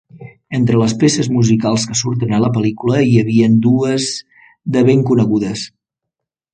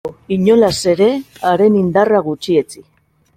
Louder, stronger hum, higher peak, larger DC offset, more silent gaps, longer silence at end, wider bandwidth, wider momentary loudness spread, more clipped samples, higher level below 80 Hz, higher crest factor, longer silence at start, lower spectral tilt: about the same, -14 LUFS vs -14 LUFS; neither; about the same, 0 dBFS vs -2 dBFS; neither; neither; first, 0.85 s vs 0.55 s; second, 9.4 kHz vs 15.5 kHz; first, 10 LU vs 7 LU; neither; about the same, -50 dBFS vs -50 dBFS; about the same, 14 dB vs 12 dB; about the same, 0.15 s vs 0.05 s; about the same, -6 dB/octave vs -6 dB/octave